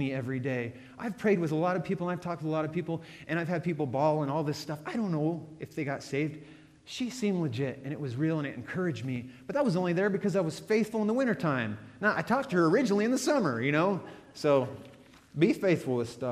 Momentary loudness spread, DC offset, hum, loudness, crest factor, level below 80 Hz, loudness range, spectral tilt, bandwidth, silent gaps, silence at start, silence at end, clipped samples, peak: 10 LU; under 0.1%; none; -30 LUFS; 18 dB; -68 dBFS; 6 LU; -6.5 dB/octave; 15 kHz; none; 0 s; 0 s; under 0.1%; -12 dBFS